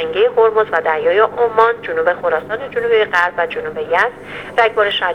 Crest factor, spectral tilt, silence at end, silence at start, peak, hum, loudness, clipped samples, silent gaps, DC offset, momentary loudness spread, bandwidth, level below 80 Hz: 16 dB; -4.5 dB/octave; 0 s; 0 s; 0 dBFS; 50 Hz at -45 dBFS; -15 LUFS; under 0.1%; none; under 0.1%; 7 LU; 9 kHz; -52 dBFS